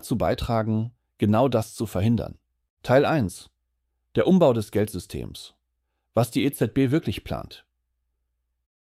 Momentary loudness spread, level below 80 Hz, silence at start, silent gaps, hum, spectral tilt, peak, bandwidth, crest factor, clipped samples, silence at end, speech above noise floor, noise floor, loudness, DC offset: 15 LU; -48 dBFS; 0.05 s; 2.70-2.77 s; none; -7 dB/octave; -6 dBFS; 15.5 kHz; 18 dB; under 0.1%; 1.35 s; 54 dB; -77 dBFS; -24 LUFS; under 0.1%